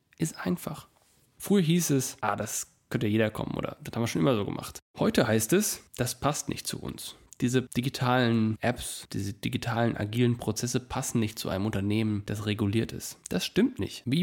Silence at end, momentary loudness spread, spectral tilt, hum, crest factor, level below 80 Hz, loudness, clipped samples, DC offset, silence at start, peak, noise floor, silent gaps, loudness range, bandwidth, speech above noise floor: 0 s; 10 LU; -5 dB/octave; none; 18 dB; -56 dBFS; -29 LUFS; under 0.1%; under 0.1%; 0.2 s; -10 dBFS; -54 dBFS; 4.82-4.94 s; 2 LU; 17 kHz; 25 dB